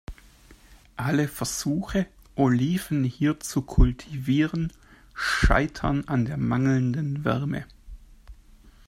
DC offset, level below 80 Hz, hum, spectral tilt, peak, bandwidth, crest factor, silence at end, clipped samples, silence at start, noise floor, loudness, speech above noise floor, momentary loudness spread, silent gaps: under 0.1%; -32 dBFS; none; -6 dB/octave; -4 dBFS; 16 kHz; 20 dB; 0.15 s; under 0.1%; 0.1 s; -52 dBFS; -26 LUFS; 28 dB; 10 LU; none